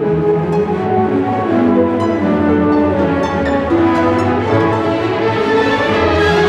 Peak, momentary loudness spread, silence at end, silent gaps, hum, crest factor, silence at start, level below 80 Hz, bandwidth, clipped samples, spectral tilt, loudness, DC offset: -2 dBFS; 3 LU; 0 s; none; none; 12 dB; 0 s; -40 dBFS; 9.8 kHz; under 0.1%; -7.5 dB/octave; -14 LUFS; under 0.1%